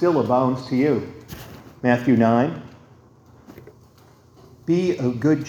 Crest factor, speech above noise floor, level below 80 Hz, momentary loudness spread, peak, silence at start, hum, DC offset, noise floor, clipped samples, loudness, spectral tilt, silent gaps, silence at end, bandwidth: 20 dB; 32 dB; -56 dBFS; 21 LU; -2 dBFS; 0 s; none; under 0.1%; -51 dBFS; under 0.1%; -20 LUFS; -8 dB/octave; none; 0 s; 19 kHz